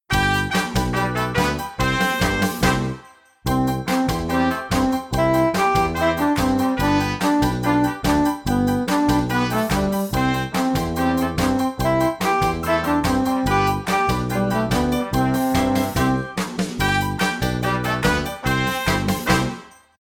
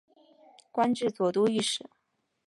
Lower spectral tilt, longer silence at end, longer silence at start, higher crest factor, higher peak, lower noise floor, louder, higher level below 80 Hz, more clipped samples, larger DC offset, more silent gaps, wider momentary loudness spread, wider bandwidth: first, -5.5 dB/octave vs -4 dB/octave; second, 0.4 s vs 0.7 s; second, 0.1 s vs 0.75 s; about the same, 16 dB vs 18 dB; first, -4 dBFS vs -12 dBFS; second, -45 dBFS vs -59 dBFS; first, -20 LUFS vs -28 LUFS; first, -34 dBFS vs -76 dBFS; neither; neither; neither; second, 3 LU vs 8 LU; first, 19 kHz vs 11.5 kHz